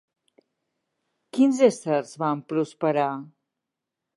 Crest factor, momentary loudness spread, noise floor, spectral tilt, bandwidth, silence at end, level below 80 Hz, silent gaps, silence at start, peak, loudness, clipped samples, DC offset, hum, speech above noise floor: 20 dB; 10 LU; -85 dBFS; -6 dB/octave; 11.5 kHz; 0.9 s; -84 dBFS; none; 1.35 s; -6 dBFS; -24 LUFS; under 0.1%; under 0.1%; none; 62 dB